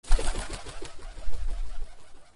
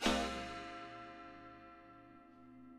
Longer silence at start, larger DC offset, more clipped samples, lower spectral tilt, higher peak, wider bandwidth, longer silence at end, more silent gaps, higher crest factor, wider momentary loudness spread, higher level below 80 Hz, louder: about the same, 0.05 s vs 0 s; neither; neither; about the same, -3.5 dB/octave vs -3.5 dB/octave; first, -8 dBFS vs -18 dBFS; second, 11.5 kHz vs 13 kHz; about the same, 0 s vs 0 s; neither; second, 18 dB vs 24 dB; second, 15 LU vs 21 LU; first, -30 dBFS vs -58 dBFS; first, -38 LUFS vs -43 LUFS